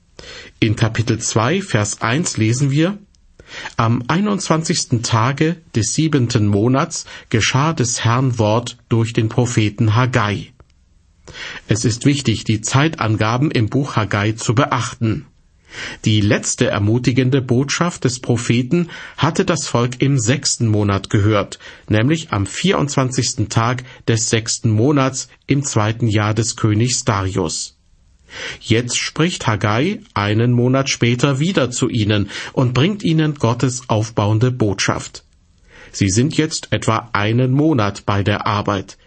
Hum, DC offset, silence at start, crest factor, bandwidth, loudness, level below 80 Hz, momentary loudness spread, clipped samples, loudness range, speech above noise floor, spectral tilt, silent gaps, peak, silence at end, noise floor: none; under 0.1%; 0.2 s; 16 dB; 8.8 kHz; -17 LUFS; -46 dBFS; 6 LU; under 0.1%; 2 LU; 36 dB; -5 dB/octave; none; -2 dBFS; 0.15 s; -53 dBFS